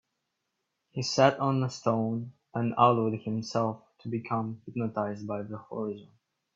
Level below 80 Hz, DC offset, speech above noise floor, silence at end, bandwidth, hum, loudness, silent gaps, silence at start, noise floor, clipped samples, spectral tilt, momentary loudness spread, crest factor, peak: -70 dBFS; under 0.1%; 53 dB; 0.5 s; 7.8 kHz; none; -30 LUFS; none; 0.95 s; -82 dBFS; under 0.1%; -6 dB/octave; 14 LU; 22 dB; -8 dBFS